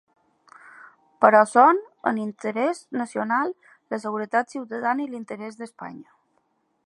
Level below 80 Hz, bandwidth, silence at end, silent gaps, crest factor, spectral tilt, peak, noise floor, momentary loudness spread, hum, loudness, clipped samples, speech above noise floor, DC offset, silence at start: -80 dBFS; 11.5 kHz; 0.85 s; none; 22 dB; -5.5 dB/octave; -2 dBFS; -70 dBFS; 20 LU; none; -22 LUFS; under 0.1%; 47 dB; under 0.1%; 1.2 s